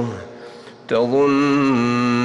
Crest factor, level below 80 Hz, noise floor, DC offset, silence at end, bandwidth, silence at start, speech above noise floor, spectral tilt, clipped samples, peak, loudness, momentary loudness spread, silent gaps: 12 dB; -58 dBFS; -39 dBFS; under 0.1%; 0 s; 9.8 kHz; 0 s; 22 dB; -6.5 dB/octave; under 0.1%; -8 dBFS; -18 LUFS; 22 LU; none